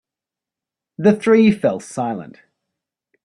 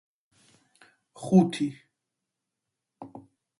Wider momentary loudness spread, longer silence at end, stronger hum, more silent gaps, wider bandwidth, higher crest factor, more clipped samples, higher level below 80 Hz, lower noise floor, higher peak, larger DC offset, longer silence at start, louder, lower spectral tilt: second, 12 LU vs 25 LU; first, 1 s vs 0.4 s; neither; neither; about the same, 11 kHz vs 11.5 kHz; about the same, 18 dB vs 22 dB; neither; first, -60 dBFS vs -72 dBFS; about the same, -87 dBFS vs -85 dBFS; first, -2 dBFS vs -8 dBFS; neither; second, 1 s vs 1.2 s; first, -17 LUFS vs -25 LUFS; about the same, -7 dB/octave vs -7.5 dB/octave